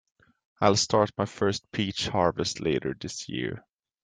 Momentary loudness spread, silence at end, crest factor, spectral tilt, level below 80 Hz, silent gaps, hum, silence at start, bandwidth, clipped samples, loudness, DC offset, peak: 11 LU; 0.45 s; 22 dB; -4.5 dB/octave; -58 dBFS; none; none; 0.6 s; 10 kHz; under 0.1%; -27 LUFS; under 0.1%; -6 dBFS